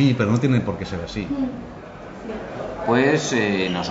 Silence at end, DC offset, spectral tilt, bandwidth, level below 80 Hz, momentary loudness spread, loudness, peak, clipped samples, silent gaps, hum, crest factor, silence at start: 0 s; under 0.1%; -6 dB/octave; 8 kHz; -46 dBFS; 17 LU; -22 LUFS; -6 dBFS; under 0.1%; none; none; 16 dB; 0 s